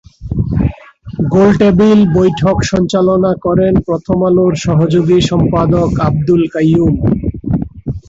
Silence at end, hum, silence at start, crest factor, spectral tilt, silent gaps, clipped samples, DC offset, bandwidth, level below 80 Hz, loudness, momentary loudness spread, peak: 0.1 s; none; 0.2 s; 10 dB; -7.5 dB/octave; none; under 0.1%; under 0.1%; 7.8 kHz; -28 dBFS; -12 LUFS; 9 LU; 0 dBFS